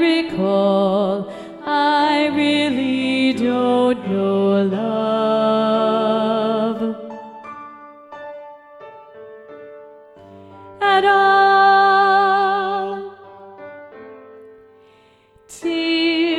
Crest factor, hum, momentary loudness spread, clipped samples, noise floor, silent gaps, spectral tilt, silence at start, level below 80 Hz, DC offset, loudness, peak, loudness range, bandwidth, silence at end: 16 dB; none; 24 LU; under 0.1%; -52 dBFS; none; -5.5 dB/octave; 0 s; -64 dBFS; under 0.1%; -17 LUFS; -4 dBFS; 14 LU; 11.5 kHz; 0 s